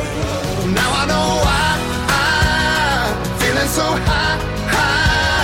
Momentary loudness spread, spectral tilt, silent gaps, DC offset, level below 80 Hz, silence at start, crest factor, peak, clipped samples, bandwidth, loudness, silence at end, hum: 6 LU; -4 dB/octave; none; under 0.1%; -26 dBFS; 0 s; 12 dB; -4 dBFS; under 0.1%; 16.5 kHz; -16 LUFS; 0 s; none